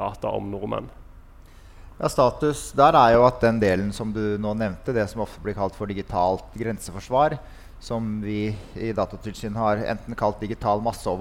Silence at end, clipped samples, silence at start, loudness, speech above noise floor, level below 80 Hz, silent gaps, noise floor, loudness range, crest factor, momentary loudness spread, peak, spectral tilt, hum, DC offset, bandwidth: 0 s; under 0.1%; 0 s; -24 LUFS; 23 dB; -42 dBFS; none; -46 dBFS; 7 LU; 22 dB; 14 LU; -2 dBFS; -6 dB/octave; none; under 0.1%; 16.5 kHz